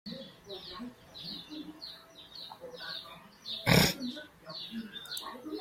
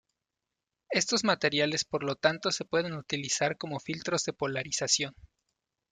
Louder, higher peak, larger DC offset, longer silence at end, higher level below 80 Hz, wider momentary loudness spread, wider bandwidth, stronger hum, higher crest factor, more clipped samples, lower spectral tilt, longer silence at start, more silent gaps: second, -34 LUFS vs -29 LUFS; about the same, -10 dBFS vs -10 dBFS; neither; second, 0 s vs 0.8 s; first, -56 dBFS vs -66 dBFS; first, 20 LU vs 8 LU; first, 16.5 kHz vs 11 kHz; neither; first, 28 dB vs 22 dB; neither; first, -4 dB/octave vs -2.5 dB/octave; second, 0.05 s vs 0.9 s; neither